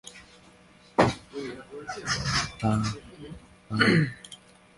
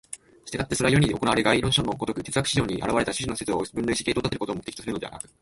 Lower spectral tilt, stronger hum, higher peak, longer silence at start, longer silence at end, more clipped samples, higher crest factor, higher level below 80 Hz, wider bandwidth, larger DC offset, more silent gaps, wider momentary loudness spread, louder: about the same, -5 dB/octave vs -4.5 dB/octave; neither; about the same, -6 dBFS vs -4 dBFS; about the same, 0.05 s vs 0.1 s; first, 0.4 s vs 0.2 s; neither; about the same, 22 dB vs 20 dB; about the same, -50 dBFS vs -46 dBFS; about the same, 11.5 kHz vs 12 kHz; neither; neither; first, 23 LU vs 12 LU; about the same, -27 LUFS vs -25 LUFS